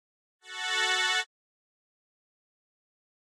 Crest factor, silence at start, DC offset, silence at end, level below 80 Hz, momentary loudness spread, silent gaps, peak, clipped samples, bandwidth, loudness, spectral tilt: 20 dB; 0.45 s; under 0.1%; 1.95 s; under -90 dBFS; 16 LU; none; -16 dBFS; under 0.1%; 16 kHz; -27 LUFS; 5.5 dB/octave